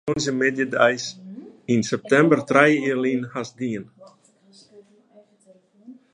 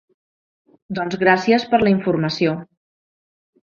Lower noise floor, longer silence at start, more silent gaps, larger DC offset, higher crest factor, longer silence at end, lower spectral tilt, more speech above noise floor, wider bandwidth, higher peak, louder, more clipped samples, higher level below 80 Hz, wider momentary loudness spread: second, -56 dBFS vs under -90 dBFS; second, 0.05 s vs 0.9 s; neither; neither; about the same, 22 dB vs 20 dB; second, 0.2 s vs 1 s; second, -5 dB/octave vs -6.5 dB/octave; second, 35 dB vs over 72 dB; first, 10.5 kHz vs 7.2 kHz; about the same, -2 dBFS vs -2 dBFS; second, -21 LUFS vs -18 LUFS; neither; second, -64 dBFS vs -56 dBFS; first, 16 LU vs 11 LU